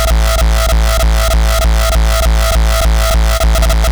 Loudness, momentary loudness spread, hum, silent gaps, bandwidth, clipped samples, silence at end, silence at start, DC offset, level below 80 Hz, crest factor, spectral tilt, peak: -12 LUFS; 0 LU; none; none; over 20 kHz; under 0.1%; 0 s; 0 s; under 0.1%; -10 dBFS; 10 dB; -4 dB/octave; 0 dBFS